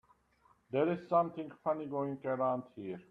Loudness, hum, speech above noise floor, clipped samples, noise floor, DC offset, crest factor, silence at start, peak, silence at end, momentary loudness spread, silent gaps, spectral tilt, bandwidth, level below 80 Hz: -35 LUFS; none; 35 dB; under 0.1%; -70 dBFS; under 0.1%; 18 dB; 0.7 s; -18 dBFS; 0.1 s; 8 LU; none; -9.5 dB/octave; 5.2 kHz; -76 dBFS